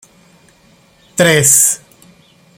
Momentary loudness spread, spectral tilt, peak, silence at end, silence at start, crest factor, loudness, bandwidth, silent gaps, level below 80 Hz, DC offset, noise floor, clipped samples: 16 LU; -2.5 dB/octave; 0 dBFS; 0.8 s; 1.15 s; 16 dB; -10 LUFS; over 20 kHz; none; -54 dBFS; under 0.1%; -49 dBFS; under 0.1%